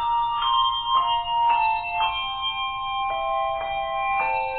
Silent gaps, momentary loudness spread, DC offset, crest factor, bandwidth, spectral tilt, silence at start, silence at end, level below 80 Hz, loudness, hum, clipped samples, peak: none; 6 LU; under 0.1%; 14 dB; 4.4 kHz; -5 dB/octave; 0 s; 0 s; -48 dBFS; -23 LUFS; none; under 0.1%; -10 dBFS